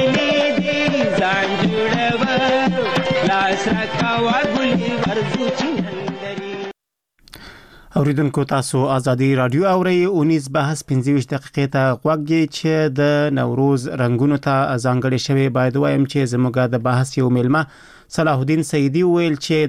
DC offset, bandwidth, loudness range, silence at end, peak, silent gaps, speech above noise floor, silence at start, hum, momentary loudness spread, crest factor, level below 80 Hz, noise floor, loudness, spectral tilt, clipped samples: under 0.1%; 13.5 kHz; 5 LU; 0 s; -6 dBFS; none; 48 dB; 0 s; none; 4 LU; 12 dB; -50 dBFS; -66 dBFS; -18 LUFS; -6 dB/octave; under 0.1%